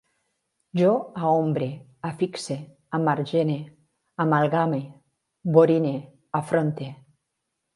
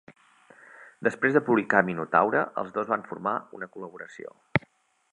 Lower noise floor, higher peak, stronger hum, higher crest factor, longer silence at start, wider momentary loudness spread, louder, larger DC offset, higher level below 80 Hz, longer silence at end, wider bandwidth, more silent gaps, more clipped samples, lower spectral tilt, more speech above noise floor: first, -80 dBFS vs -61 dBFS; about the same, -4 dBFS vs -4 dBFS; neither; about the same, 22 dB vs 24 dB; first, 0.75 s vs 0.1 s; second, 14 LU vs 18 LU; about the same, -24 LUFS vs -26 LUFS; neither; second, -70 dBFS vs -64 dBFS; first, 0.8 s vs 0.55 s; about the same, 11.5 kHz vs 10.5 kHz; neither; neither; about the same, -7.5 dB/octave vs -7.5 dB/octave; first, 57 dB vs 35 dB